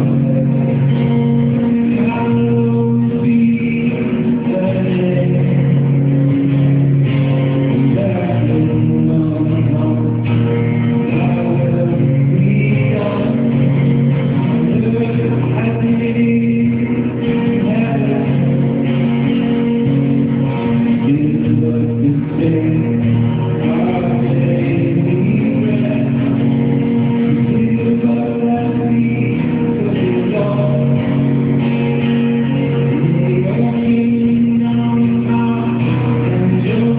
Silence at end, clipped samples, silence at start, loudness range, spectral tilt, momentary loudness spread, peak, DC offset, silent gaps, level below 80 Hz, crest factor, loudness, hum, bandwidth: 0 s; under 0.1%; 0 s; 1 LU; -12.5 dB/octave; 2 LU; -4 dBFS; under 0.1%; none; -40 dBFS; 10 dB; -14 LUFS; none; 4 kHz